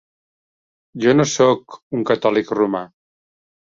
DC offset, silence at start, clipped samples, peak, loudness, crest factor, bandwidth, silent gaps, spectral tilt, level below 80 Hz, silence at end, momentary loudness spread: under 0.1%; 0.95 s; under 0.1%; -2 dBFS; -18 LUFS; 18 dB; 7.6 kHz; 1.82-1.91 s; -5 dB/octave; -60 dBFS; 0.9 s; 12 LU